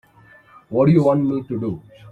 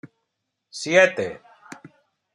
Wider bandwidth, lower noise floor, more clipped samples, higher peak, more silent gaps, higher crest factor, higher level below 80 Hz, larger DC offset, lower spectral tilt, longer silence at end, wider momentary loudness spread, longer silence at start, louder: second, 8 kHz vs 11 kHz; second, -50 dBFS vs -79 dBFS; neither; about the same, -4 dBFS vs -2 dBFS; neither; second, 16 dB vs 22 dB; first, -54 dBFS vs -72 dBFS; neither; first, -10.5 dB/octave vs -3.5 dB/octave; second, 0 s vs 0.45 s; second, 13 LU vs 23 LU; first, 0.7 s vs 0.05 s; about the same, -19 LUFS vs -20 LUFS